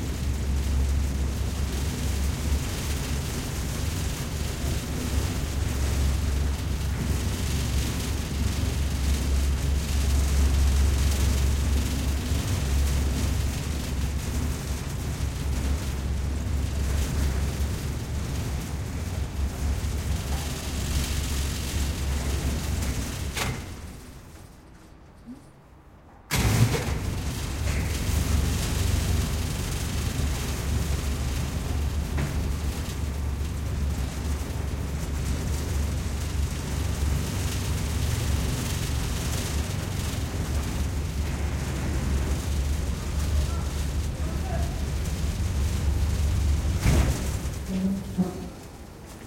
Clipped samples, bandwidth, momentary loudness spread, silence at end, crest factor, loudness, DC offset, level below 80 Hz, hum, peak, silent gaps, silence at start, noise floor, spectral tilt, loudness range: under 0.1%; 16.5 kHz; 6 LU; 0 s; 20 dB; -28 LUFS; under 0.1%; -30 dBFS; none; -6 dBFS; none; 0 s; -50 dBFS; -5 dB/octave; 4 LU